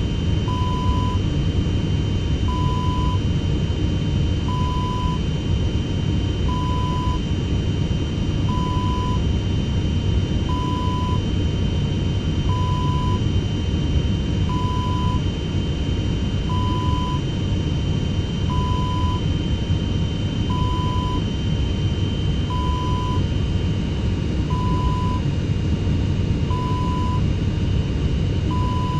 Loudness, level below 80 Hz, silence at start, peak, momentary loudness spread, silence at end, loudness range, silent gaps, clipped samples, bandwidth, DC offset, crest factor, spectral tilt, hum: -22 LUFS; -26 dBFS; 0 s; -8 dBFS; 2 LU; 0 s; 1 LU; none; under 0.1%; 8.2 kHz; under 0.1%; 14 dB; -7 dB/octave; none